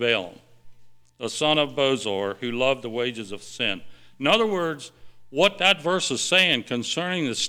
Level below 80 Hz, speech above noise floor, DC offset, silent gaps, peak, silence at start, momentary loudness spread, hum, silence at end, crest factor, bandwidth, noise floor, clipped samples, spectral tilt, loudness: -60 dBFS; 21 dB; under 0.1%; none; -6 dBFS; 0 s; 16 LU; none; 0 s; 20 dB; 19.5 kHz; -45 dBFS; under 0.1%; -3 dB/octave; -23 LUFS